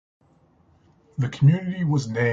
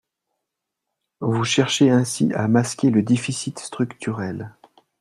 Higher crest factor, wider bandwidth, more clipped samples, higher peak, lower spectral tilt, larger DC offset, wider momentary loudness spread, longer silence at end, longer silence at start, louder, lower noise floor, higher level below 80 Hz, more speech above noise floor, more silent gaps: about the same, 18 dB vs 18 dB; second, 7.6 kHz vs 12.5 kHz; neither; about the same, -6 dBFS vs -4 dBFS; first, -7.5 dB/octave vs -5 dB/octave; neither; second, 10 LU vs 13 LU; second, 0 s vs 0.5 s; about the same, 1.2 s vs 1.2 s; about the same, -22 LUFS vs -21 LUFS; second, -59 dBFS vs -82 dBFS; about the same, -58 dBFS vs -62 dBFS; second, 39 dB vs 62 dB; neither